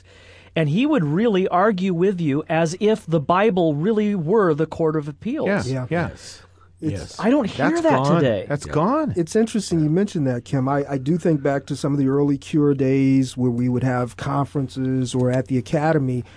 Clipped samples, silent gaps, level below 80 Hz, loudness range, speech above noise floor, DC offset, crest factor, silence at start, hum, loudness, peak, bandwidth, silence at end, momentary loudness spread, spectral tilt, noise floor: under 0.1%; none; -52 dBFS; 3 LU; 27 dB; under 0.1%; 16 dB; 0.55 s; none; -21 LUFS; -4 dBFS; 11 kHz; 0.1 s; 7 LU; -7 dB/octave; -47 dBFS